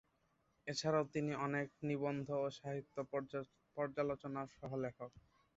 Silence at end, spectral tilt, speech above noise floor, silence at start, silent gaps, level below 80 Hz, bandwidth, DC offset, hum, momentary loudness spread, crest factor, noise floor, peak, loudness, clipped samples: 0.35 s; -5.5 dB/octave; 38 dB; 0.65 s; none; -74 dBFS; 8 kHz; under 0.1%; none; 10 LU; 18 dB; -79 dBFS; -24 dBFS; -42 LUFS; under 0.1%